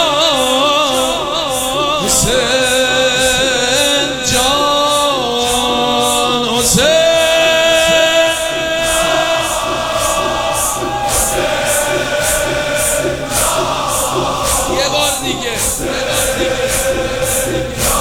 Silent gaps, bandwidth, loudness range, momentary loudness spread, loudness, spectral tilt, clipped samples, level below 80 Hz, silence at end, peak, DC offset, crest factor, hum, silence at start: none; over 20 kHz; 3 LU; 6 LU; -13 LUFS; -2 dB/octave; under 0.1%; -32 dBFS; 0 s; 0 dBFS; under 0.1%; 14 dB; none; 0 s